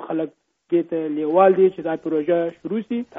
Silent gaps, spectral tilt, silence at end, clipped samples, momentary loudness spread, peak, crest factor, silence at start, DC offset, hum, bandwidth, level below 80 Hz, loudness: none; -6.5 dB/octave; 0 s; under 0.1%; 12 LU; -4 dBFS; 18 dB; 0 s; under 0.1%; none; 3.8 kHz; -68 dBFS; -21 LUFS